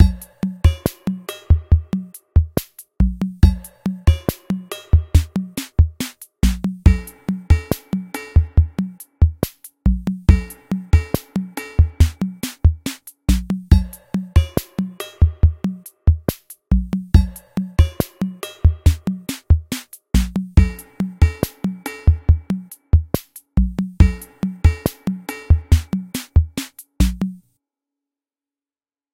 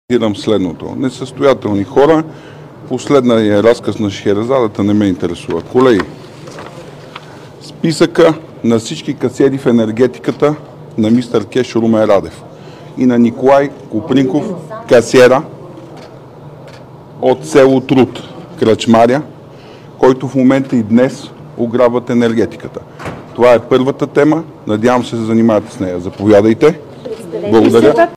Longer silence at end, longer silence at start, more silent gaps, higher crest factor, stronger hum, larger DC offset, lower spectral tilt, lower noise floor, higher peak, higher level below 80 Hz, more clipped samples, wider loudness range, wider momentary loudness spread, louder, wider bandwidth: first, 1.8 s vs 0 s; about the same, 0 s vs 0.1 s; neither; first, 18 dB vs 12 dB; neither; neither; about the same, -7 dB/octave vs -6.5 dB/octave; first, under -90 dBFS vs -34 dBFS; about the same, 0 dBFS vs 0 dBFS; first, -22 dBFS vs -48 dBFS; neither; about the same, 1 LU vs 3 LU; second, 10 LU vs 20 LU; second, -20 LUFS vs -12 LUFS; first, 16.5 kHz vs 14.5 kHz